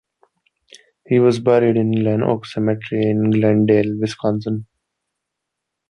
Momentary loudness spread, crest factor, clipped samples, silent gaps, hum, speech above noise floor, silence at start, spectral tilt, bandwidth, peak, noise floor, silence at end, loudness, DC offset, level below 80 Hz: 7 LU; 16 dB; under 0.1%; none; none; 63 dB; 1.1 s; -8 dB/octave; 10.5 kHz; -2 dBFS; -80 dBFS; 1.25 s; -18 LUFS; under 0.1%; -56 dBFS